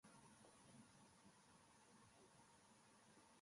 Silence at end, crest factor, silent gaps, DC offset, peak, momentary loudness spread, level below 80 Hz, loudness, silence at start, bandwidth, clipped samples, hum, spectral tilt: 0 s; 16 dB; none; under 0.1%; -54 dBFS; 2 LU; under -90 dBFS; -68 LUFS; 0 s; 11.5 kHz; under 0.1%; none; -3.5 dB/octave